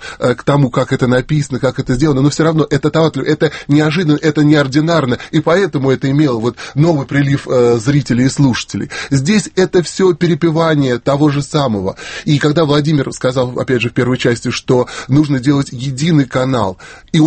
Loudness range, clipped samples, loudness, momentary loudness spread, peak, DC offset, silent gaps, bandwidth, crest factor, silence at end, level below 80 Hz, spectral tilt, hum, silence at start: 2 LU; under 0.1%; -14 LUFS; 5 LU; 0 dBFS; under 0.1%; none; 8.8 kHz; 12 dB; 0 s; -40 dBFS; -6.5 dB/octave; none; 0 s